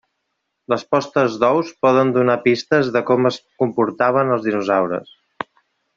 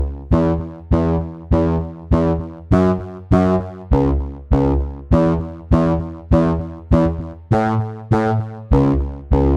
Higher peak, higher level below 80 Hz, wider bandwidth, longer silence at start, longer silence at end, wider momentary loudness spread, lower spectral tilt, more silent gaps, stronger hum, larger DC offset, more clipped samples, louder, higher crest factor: about the same, 0 dBFS vs -2 dBFS; second, -62 dBFS vs -24 dBFS; about the same, 7.4 kHz vs 7.6 kHz; first, 0.7 s vs 0 s; first, 0.95 s vs 0 s; about the same, 8 LU vs 7 LU; second, -6.5 dB/octave vs -10 dB/octave; neither; neither; neither; neither; about the same, -18 LUFS vs -18 LUFS; about the same, 18 dB vs 16 dB